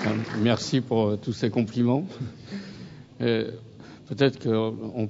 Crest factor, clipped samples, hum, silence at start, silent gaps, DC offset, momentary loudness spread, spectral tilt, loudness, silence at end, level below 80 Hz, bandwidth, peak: 18 dB; under 0.1%; none; 0 s; none; under 0.1%; 18 LU; -6.5 dB/octave; -26 LUFS; 0 s; -62 dBFS; 7.8 kHz; -8 dBFS